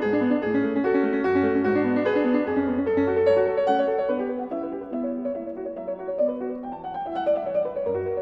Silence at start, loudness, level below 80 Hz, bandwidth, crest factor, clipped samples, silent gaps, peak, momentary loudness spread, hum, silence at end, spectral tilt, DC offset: 0 s; -24 LUFS; -58 dBFS; 5.8 kHz; 14 dB; under 0.1%; none; -10 dBFS; 11 LU; none; 0 s; -8.5 dB/octave; under 0.1%